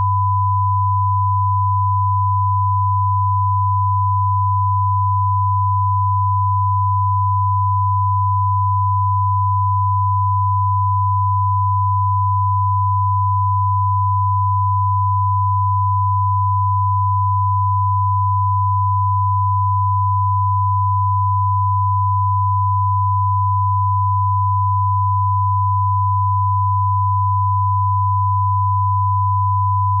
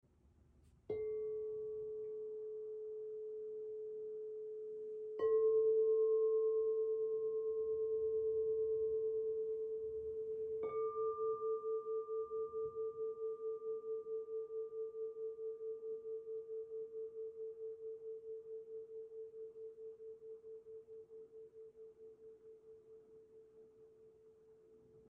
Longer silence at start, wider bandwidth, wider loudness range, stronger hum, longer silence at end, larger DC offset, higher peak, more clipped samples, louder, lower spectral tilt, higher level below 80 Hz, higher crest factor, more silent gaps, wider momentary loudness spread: second, 0 s vs 0.9 s; second, 1.1 kHz vs 2.4 kHz; second, 0 LU vs 19 LU; neither; about the same, 0 s vs 0.1 s; neither; first, -10 dBFS vs -28 dBFS; neither; first, -17 LUFS vs -41 LUFS; first, -5.5 dB/octave vs -3.5 dB/octave; first, -52 dBFS vs -78 dBFS; second, 6 dB vs 14 dB; neither; second, 0 LU vs 20 LU